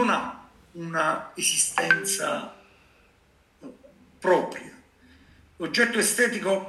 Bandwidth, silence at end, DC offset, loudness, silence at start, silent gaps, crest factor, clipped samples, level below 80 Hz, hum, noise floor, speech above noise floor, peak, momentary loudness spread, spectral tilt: 13 kHz; 0 s; under 0.1%; -24 LUFS; 0 s; none; 24 dB; under 0.1%; -66 dBFS; none; -61 dBFS; 36 dB; -4 dBFS; 16 LU; -2 dB/octave